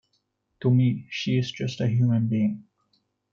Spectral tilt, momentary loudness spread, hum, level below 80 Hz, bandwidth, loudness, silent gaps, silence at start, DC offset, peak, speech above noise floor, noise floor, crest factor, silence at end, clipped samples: -7.5 dB/octave; 8 LU; none; -64 dBFS; 7.2 kHz; -25 LUFS; none; 0.6 s; under 0.1%; -12 dBFS; 50 dB; -74 dBFS; 14 dB; 0.7 s; under 0.1%